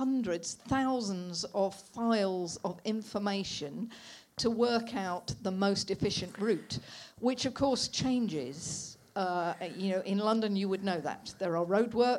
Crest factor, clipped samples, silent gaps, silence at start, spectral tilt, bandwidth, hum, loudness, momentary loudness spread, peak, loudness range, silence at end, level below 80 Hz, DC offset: 18 dB; under 0.1%; none; 0 s; -4.5 dB/octave; 15.5 kHz; none; -33 LUFS; 8 LU; -14 dBFS; 2 LU; 0 s; -64 dBFS; under 0.1%